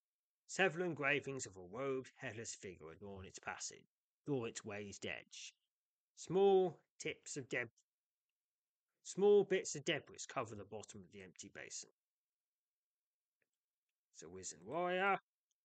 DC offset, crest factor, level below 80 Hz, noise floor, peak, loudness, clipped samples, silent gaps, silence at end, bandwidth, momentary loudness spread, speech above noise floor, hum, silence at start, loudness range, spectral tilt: under 0.1%; 22 dB; -82 dBFS; under -90 dBFS; -20 dBFS; -40 LUFS; under 0.1%; 3.87-4.24 s, 5.68-6.15 s, 6.90-6.99 s, 7.71-8.87 s, 11.91-13.40 s, 13.49-14.12 s; 0.45 s; 9 kHz; 21 LU; over 49 dB; none; 0.5 s; 15 LU; -4 dB/octave